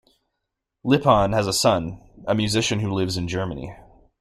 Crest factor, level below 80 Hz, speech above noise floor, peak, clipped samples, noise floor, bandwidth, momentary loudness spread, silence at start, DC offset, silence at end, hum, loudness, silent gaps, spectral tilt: 20 dB; -46 dBFS; 59 dB; -2 dBFS; under 0.1%; -81 dBFS; 16 kHz; 16 LU; 0.85 s; under 0.1%; 0.4 s; none; -21 LUFS; none; -5 dB/octave